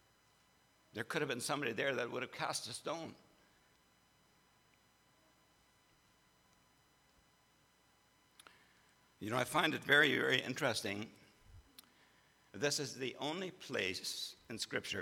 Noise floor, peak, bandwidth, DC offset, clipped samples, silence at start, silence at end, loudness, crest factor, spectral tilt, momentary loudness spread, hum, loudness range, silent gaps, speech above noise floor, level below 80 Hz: -72 dBFS; -14 dBFS; 19 kHz; under 0.1%; under 0.1%; 0.95 s; 0 s; -37 LUFS; 28 dB; -3 dB/octave; 15 LU; none; 12 LU; none; 34 dB; -78 dBFS